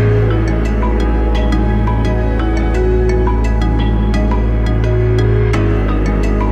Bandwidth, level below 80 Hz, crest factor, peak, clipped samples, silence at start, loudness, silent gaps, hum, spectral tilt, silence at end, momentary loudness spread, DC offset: 7.4 kHz; -14 dBFS; 10 dB; -2 dBFS; under 0.1%; 0 s; -15 LUFS; none; none; -8 dB/octave; 0 s; 2 LU; under 0.1%